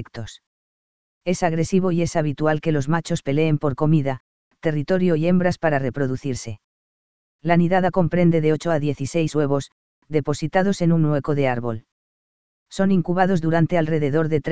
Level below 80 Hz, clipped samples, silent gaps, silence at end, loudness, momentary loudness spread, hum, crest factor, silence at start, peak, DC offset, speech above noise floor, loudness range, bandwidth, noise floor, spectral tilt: -48 dBFS; under 0.1%; 0.47-1.21 s, 4.20-4.51 s, 6.64-7.39 s, 9.72-10.02 s, 11.92-12.66 s; 0 s; -21 LUFS; 11 LU; none; 18 dB; 0 s; -2 dBFS; 2%; over 70 dB; 2 LU; 8 kHz; under -90 dBFS; -7 dB/octave